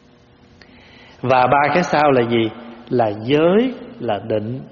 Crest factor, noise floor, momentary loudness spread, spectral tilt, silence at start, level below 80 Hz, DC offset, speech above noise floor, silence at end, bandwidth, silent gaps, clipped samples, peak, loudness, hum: 16 dB; -49 dBFS; 10 LU; -4.5 dB/octave; 1.25 s; -52 dBFS; under 0.1%; 33 dB; 0.05 s; 7 kHz; none; under 0.1%; -2 dBFS; -17 LUFS; none